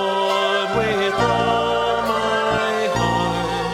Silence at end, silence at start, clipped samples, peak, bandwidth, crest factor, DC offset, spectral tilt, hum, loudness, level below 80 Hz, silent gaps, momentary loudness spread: 0 s; 0 s; under 0.1%; -6 dBFS; 16.5 kHz; 14 dB; under 0.1%; -4.5 dB/octave; none; -19 LUFS; -42 dBFS; none; 2 LU